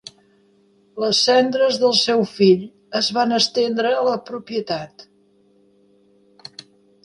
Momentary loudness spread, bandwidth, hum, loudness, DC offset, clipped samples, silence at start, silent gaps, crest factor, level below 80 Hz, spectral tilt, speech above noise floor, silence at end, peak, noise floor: 17 LU; 11.5 kHz; none; -18 LUFS; under 0.1%; under 0.1%; 0.95 s; none; 18 dB; -66 dBFS; -4 dB/octave; 39 dB; 2 s; -4 dBFS; -57 dBFS